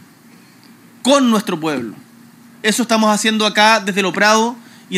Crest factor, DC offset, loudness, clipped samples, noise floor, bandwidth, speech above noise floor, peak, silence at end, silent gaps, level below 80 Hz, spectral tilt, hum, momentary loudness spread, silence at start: 16 dB; under 0.1%; -15 LUFS; under 0.1%; -45 dBFS; 15.5 kHz; 30 dB; 0 dBFS; 0 s; none; -74 dBFS; -3 dB/octave; none; 10 LU; 1.05 s